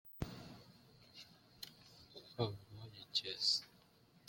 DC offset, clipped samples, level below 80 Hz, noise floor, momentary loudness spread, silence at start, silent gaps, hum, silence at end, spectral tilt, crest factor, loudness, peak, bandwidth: under 0.1%; under 0.1%; -68 dBFS; -69 dBFS; 25 LU; 0.05 s; none; none; 0.5 s; -3.5 dB/octave; 24 dB; -39 LUFS; -22 dBFS; 16.5 kHz